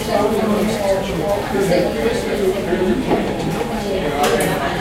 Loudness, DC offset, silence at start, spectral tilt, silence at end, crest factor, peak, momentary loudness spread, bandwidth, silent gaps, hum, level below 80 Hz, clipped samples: -18 LUFS; under 0.1%; 0 s; -5 dB/octave; 0 s; 14 dB; -4 dBFS; 4 LU; 16 kHz; none; none; -36 dBFS; under 0.1%